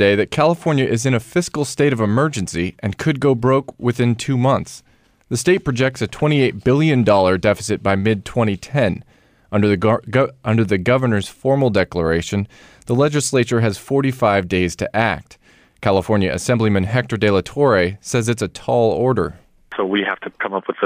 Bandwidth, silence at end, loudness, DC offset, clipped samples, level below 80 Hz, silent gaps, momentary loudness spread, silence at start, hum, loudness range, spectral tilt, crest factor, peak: 15.5 kHz; 0 s; -18 LUFS; under 0.1%; under 0.1%; -46 dBFS; none; 7 LU; 0 s; none; 2 LU; -6 dB/octave; 14 dB; -4 dBFS